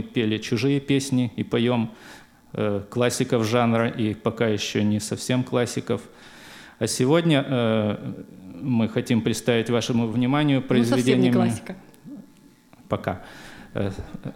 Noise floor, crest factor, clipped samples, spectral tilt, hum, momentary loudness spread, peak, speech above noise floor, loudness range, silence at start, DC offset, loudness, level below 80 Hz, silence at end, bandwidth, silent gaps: -52 dBFS; 18 dB; under 0.1%; -5.5 dB/octave; none; 19 LU; -6 dBFS; 30 dB; 3 LU; 0 s; under 0.1%; -23 LUFS; -56 dBFS; 0 s; 16 kHz; none